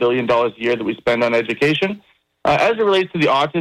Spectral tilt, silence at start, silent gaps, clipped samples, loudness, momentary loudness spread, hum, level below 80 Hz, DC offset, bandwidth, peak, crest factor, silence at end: -5.5 dB/octave; 0 s; none; under 0.1%; -17 LUFS; 5 LU; none; -52 dBFS; under 0.1%; 13 kHz; -8 dBFS; 10 dB; 0 s